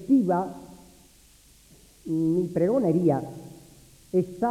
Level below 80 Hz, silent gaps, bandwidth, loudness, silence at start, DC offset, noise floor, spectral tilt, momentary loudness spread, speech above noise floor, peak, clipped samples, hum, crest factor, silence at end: -60 dBFS; none; 14.5 kHz; -25 LUFS; 0 s; under 0.1%; -55 dBFS; -9 dB/octave; 21 LU; 31 dB; -10 dBFS; under 0.1%; none; 16 dB; 0 s